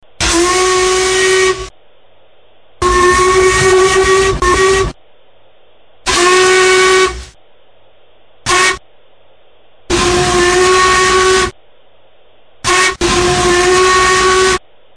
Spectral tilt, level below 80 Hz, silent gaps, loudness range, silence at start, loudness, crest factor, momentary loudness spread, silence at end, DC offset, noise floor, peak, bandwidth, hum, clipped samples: -2.5 dB/octave; -30 dBFS; none; 3 LU; 0.2 s; -10 LUFS; 12 dB; 9 LU; 0.4 s; under 0.1%; -49 dBFS; 0 dBFS; 11 kHz; none; under 0.1%